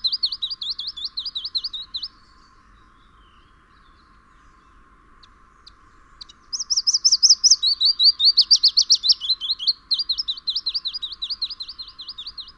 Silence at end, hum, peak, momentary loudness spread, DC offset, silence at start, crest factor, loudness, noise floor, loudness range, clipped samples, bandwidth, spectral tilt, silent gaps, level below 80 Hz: 0.05 s; none; -4 dBFS; 18 LU; under 0.1%; 0.05 s; 20 dB; -17 LUFS; -53 dBFS; 17 LU; under 0.1%; 18.5 kHz; 3.5 dB/octave; none; -56 dBFS